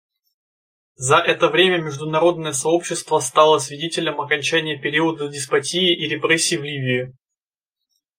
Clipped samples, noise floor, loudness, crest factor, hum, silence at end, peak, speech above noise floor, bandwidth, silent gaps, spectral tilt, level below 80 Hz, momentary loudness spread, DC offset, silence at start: under 0.1%; -86 dBFS; -19 LUFS; 20 dB; none; 1.05 s; 0 dBFS; 67 dB; 16 kHz; none; -3 dB/octave; -64 dBFS; 8 LU; under 0.1%; 1 s